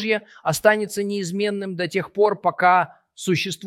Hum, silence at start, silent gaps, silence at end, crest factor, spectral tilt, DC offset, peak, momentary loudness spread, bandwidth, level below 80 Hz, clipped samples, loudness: none; 0 s; none; 0 s; 20 dB; -4.5 dB/octave; under 0.1%; -2 dBFS; 8 LU; 16.5 kHz; -64 dBFS; under 0.1%; -21 LUFS